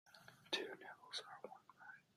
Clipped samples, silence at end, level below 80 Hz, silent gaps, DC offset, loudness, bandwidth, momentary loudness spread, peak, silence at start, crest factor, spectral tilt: under 0.1%; 0.15 s; under -90 dBFS; none; under 0.1%; -49 LUFS; 15 kHz; 17 LU; -26 dBFS; 0.05 s; 26 dB; -1.5 dB/octave